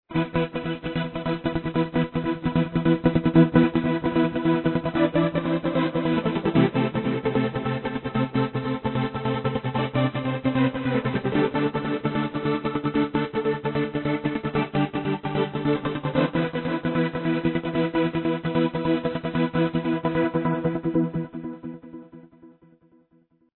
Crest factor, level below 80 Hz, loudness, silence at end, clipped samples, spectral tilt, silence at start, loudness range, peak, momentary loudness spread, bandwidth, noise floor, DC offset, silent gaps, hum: 20 dB; -48 dBFS; -24 LUFS; 1.05 s; under 0.1%; -11 dB/octave; 0.1 s; 4 LU; -4 dBFS; 6 LU; 4.3 kHz; -62 dBFS; under 0.1%; none; none